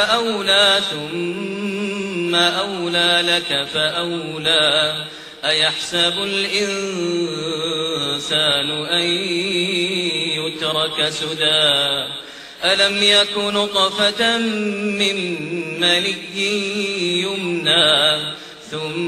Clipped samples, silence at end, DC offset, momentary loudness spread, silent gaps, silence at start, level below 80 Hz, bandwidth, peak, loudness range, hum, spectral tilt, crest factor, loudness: under 0.1%; 0 s; under 0.1%; 10 LU; none; 0 s; -58 dBFS; 15.5 kHz; -2 dBFS; 3 LU; none; -2.5 dB/octave; 18 dB; -17 LUFS